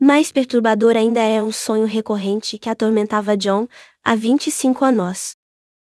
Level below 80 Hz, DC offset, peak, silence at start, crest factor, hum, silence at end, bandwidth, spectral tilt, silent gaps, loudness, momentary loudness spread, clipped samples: -66 dBFS; under 0.1%; 0 dBFS; 0 s; 18 dB; none; 0.5 s; 12 kHz; -4.5 dB/octave; none; -18 LUFS; 9 LU; under 0.1%